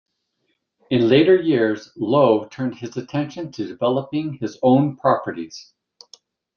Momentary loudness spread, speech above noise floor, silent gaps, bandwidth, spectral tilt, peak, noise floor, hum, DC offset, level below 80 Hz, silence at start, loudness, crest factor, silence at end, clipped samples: 15 LU; 53 dB; none; 7 kHz; -7 dB/octave; -2 dBFS; -72 dBFS; none; under 0.1%; -62 dBFS; 0.9 s; -20 LUFS; 18 dB; 0.95 s; under 0.1%